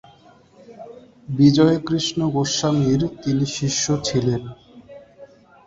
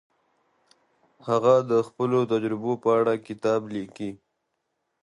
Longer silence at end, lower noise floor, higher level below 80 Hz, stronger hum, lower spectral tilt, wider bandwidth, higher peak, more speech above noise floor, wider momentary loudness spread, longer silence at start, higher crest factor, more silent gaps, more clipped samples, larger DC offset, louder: second, 0.4 s vs 0.9 s; second, -51 dBFS vs -78 dBFS; first, -50 dBFS vs -70 dBFS; neither; second, -5.5 dB/octave vs -7 dB/octave; second, 7.8 kHz vs 11 kHz; first, -2 dBFS vs -6 dBFS; second, 32 dB vs 54 dB; about the same, 17 LU vs 15 LU; second, 0.7 s vs 1.25 s; about the same, 18 dB vs 20 dB; neither; neither; neither; first, -20 LUFS vs -24 LUFS